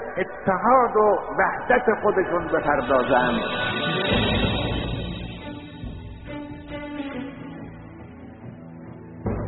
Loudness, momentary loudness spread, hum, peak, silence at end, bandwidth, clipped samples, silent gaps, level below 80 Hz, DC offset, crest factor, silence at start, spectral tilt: -22 LUFS; 21 LU; none; -6 dBFS; 0 s; 4.2 kHz; under 0.1%; none; -40 dBFS; under 0.1%; 18 dB; 0 s; -3.5 dB/octave